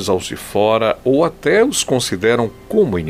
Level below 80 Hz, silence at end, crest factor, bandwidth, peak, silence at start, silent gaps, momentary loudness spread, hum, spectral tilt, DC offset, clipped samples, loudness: -44 dBFS; 0 s; 14 dB; 16 kHz; -2 dBFS; 0 s; none; 5 LU; none; -4.5 dB/octave; under 0.1%; under 0.1%; -16 LUFS